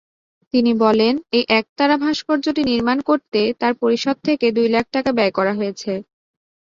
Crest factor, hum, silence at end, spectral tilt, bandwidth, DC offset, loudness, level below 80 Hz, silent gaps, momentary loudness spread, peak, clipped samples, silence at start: 16 dB; none; 0.75 s; -5 dB/octave; 7.6 kHz; under 0.1%; -18 LUFS; -56 dBFS; 1.69-1.76 s; 5 LU; -2 dBFS; under 0.1%; 0.55 s